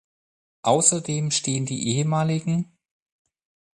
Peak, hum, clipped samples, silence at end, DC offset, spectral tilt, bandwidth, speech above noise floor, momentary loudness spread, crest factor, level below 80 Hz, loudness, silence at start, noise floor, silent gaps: -2 dBFS; none; under 0.1%; 1.15 s; under 0.1%; -4.5 dB/octave; 11.5 kHz; over 68 dB; 9 LU; 24 dB; -62 dBFS; -22 LUFS; 0.65 s; under -90 dBFS; none